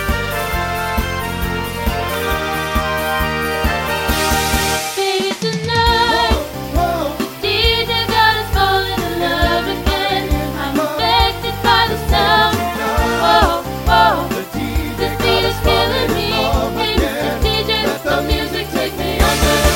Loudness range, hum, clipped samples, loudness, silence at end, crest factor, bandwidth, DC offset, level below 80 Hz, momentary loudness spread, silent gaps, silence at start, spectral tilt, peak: 3 LU; none; under 0.1%; -16 LUFS; 0 s; 16 dB; 17 kHz; under 0.1%; -24 dBFS; 7 LU; none; 0 s; -4 dB/octave; 0 dBFS